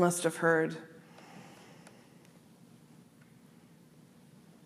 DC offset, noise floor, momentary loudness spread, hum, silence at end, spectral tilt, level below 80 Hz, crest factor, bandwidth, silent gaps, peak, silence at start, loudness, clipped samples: under 0.1%; -59 dBFS; 26 LU; none; 2.75 s; -5 dB/octave; -84 dBFS; 24 dB; 15.5 kHz; none; -12 dBFS; 0 s; -30 LUFS; under 0.1%